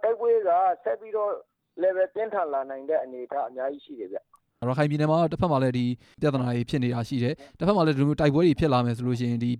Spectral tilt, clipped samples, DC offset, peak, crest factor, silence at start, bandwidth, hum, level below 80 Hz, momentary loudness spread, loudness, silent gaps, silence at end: -8 dB/octave; under 0.1%; under 0.1%; -8 dBFS; 18 dB; 0 s; 11 kHz; none; -54 dBFS; 11 LU; -26 LUFS; none; 0 s